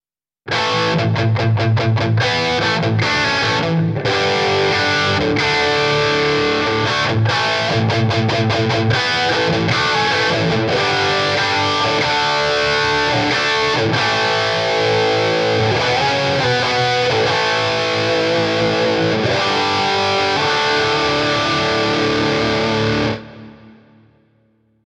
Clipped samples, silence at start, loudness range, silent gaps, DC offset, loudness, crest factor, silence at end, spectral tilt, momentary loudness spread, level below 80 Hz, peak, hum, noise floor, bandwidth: under 0.1%; 0.45 s; 1 LU; none; under 0.1%; -16 LUFS; 12 dB; 1.2 s; -4.5 dB/octave; 2 LU; -44 dBFS; -4 dBFS; none; -58 dBFS; 10.5 kHz